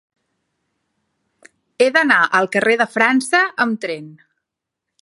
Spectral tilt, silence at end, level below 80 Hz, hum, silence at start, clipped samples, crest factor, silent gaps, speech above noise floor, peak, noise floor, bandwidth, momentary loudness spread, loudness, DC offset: -3.5 dB/octave; 0.9 s; -70 dBFS; none; 1.8 s; under 0.1%; 20 dB; none; 65 dB; 0 dBFS; -81 dBFS; 11.5 kHz; 10 LU; -16 LUFS; under 0.1%